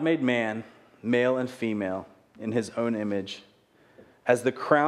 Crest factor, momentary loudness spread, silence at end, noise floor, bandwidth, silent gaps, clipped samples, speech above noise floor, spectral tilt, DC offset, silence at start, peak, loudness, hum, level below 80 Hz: 22 dB; 14 LU; 0 s; -59 dBFS; 13 kHz; none; under 0.1%; 33 dB; -6 dB/octave; under 0.1%; 0 s; -6 dBFS; -28 LUFS; none; -74 dBFS